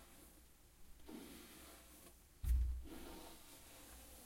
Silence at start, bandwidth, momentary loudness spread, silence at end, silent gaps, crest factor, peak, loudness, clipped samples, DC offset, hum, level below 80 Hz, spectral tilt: 0 s; 16.5 kHz; 22 LU; 0 s; none; 20 dB; -28 dBFS; -49 LUFS; under 0.1%; under 0.1%; none; -48 dBFS; -5 dB/octave